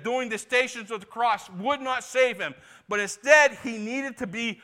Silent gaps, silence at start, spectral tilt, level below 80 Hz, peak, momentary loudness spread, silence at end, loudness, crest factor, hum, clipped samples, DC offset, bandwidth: none; 0 s; -2.5 dB/octave; -70 dBFS; -4 dBFS; 15 LU; 0.1 s; -25 LUFS; 22 dB; none; under 0.1%; under 0.1%; 16 kHz